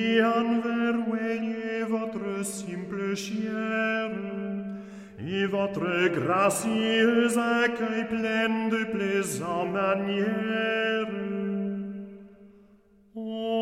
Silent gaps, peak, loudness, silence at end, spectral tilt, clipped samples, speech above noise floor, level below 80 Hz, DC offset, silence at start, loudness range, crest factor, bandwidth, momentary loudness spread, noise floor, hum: none; -10 dBFS; -27 LUFS; 0 s; -4.5 dB/octave; under 0.1%; 33 dB; -68 dBFS; under 0.1%; 0 s; 6 LU; 16 dB; 15.5 kHz; 11 LU; -58 dBFS; none